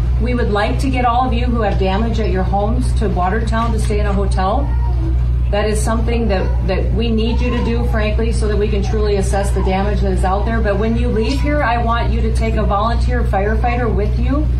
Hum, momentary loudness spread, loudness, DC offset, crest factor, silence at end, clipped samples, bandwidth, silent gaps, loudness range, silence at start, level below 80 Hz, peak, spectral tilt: none; 1 LU; -17 LUFS; under 0.1%; 10 dB; 0 s; under 0.1%; 11.5 kHz; none; 1 LU; 0 s; -18 dBFS; -4 dBFS; -7 dB/octave